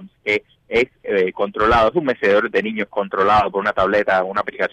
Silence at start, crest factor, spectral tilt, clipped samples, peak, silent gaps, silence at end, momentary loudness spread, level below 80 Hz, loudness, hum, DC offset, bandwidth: 0 s; 14 dB; -6 dB/octave; under 0.1%; -4 dBFS; none; 0.05 s; 7 LU; -42 dBFS; -18 LUFS; none; under 0.1%; 9.2 kHz